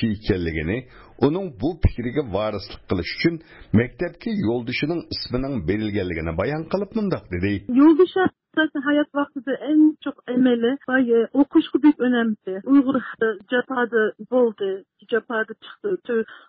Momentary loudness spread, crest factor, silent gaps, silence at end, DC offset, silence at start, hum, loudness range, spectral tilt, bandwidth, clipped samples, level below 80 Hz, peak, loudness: 10 LU; 14 dB; none; 0.1 s; under 0.1%; 0 s; none; 5 LU; -11 dB/octave; 5.8 kHz; under 0.1%; -40 dBFS; -8 dBFS; -22 LUFS